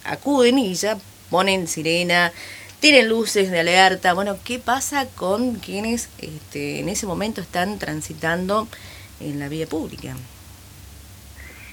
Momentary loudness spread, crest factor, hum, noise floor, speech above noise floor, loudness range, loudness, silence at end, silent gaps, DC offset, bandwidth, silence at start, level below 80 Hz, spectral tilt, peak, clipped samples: 20 LU; 22 dB; none; -42 dBFS; 22 dB; 10 LU; -20 LUFS; 0 s; none; under 0.1%; over 20 kHz; 0.05 s; -50 dBFS; -3.5 dB/octave; 0 dBFS; under 0.1%